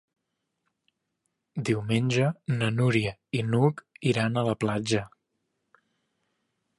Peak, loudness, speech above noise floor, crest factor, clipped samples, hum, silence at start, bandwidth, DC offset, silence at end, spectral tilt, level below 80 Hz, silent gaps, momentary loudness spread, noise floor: -10 dBFS; -27 LUFS; 55 dB; 20 dB; under 0.1%; none; 1.55 s; 11.5 kHz; under 0.1%; 1.7 s; -6.5 dB/octave; -62 dBFS; none; 7 LU; -81 dBFS